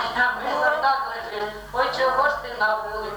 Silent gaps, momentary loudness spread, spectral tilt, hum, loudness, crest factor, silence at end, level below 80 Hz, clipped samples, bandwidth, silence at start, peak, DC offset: none; 9 LU; -3 dB/octave; none; -23 LUFS; 16 dB; 0 s; -50 dBFS; under 0.1%; over 20 kHz; 0 s; -8 dBFS; under 0.1%